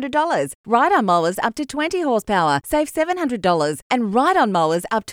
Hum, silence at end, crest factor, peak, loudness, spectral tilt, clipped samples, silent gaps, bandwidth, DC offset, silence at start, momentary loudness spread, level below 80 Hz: none; 0 s; 14 dB; -4 dBFS; -19 LUFS; -5 dB/octave; under 0.1%; 0.55-0.64 s, 3.82-3.90 s; 19 kHz; under 0.1%; 0 s; 6 LU; -50 dBFS